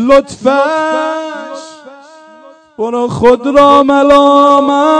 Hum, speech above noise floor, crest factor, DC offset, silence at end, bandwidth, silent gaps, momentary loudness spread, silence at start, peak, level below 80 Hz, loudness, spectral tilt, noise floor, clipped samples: none; 30 dB; 10 dB; under 0.1%; 0 s; 11 kHz; none; 15 LU; 0 s; 0 dBFS; -40 dBFS; -9 LUFS; -5 dB/octave; -38 dBFS; 3%